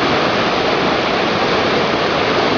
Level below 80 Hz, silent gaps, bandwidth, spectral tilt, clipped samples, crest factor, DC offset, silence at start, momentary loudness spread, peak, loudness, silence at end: -44 dBFS; none; 7.4 kHz; -4.5 dB/octave; under 0.1%; 14 dB; under 0.1%; 0 s; 1 LU; -2 dBFS; -15 LUFS; 0 s